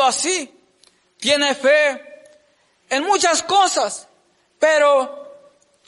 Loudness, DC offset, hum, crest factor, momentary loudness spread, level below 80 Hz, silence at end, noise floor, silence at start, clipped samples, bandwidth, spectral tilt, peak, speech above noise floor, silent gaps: -17 LUFS; under 0.1%; none; 14 dB; 15 LU; -70 dBFS; 0.55 s; -60 dBFS; 0 s; under 0.1%; 11.5 kHz; -0.5 dB/octave; -4 dBFS; 43 dB; none